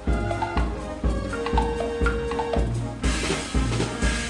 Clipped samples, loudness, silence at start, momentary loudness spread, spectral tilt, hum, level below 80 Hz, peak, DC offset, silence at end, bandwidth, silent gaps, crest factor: under 0.1%; -26 LUFS; 0 s; 3 LU; -5 dB/octave; none; -28 dBFS; -10 dBFS; under 0.1%; 0 s; 11.5 kHz; none; 16 dB